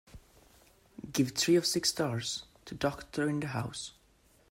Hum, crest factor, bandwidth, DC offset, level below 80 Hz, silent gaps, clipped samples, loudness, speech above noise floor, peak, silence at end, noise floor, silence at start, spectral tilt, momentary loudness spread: none; 18 dB; 16 kHz; under 0.1%; -62 dBFS; none; under 0.1%; -32 LUFS; 34 dB; -16 dBFS; 0.6 s; -65 dBFS; 0.15 s; -4 dB/octave; 15 LU